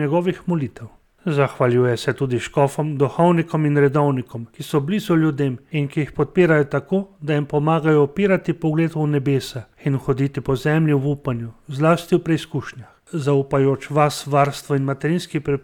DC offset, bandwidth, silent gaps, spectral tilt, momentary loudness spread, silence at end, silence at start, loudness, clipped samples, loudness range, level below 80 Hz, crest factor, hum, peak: under 0.1%; 17 kHz; none; -7.5 dB/octave; 8 LU; 0.05 s; 0 s; -20 LUFS; under 0.1%; 2 LU; -50 dBFS; 16 dB; none; -4 dBFS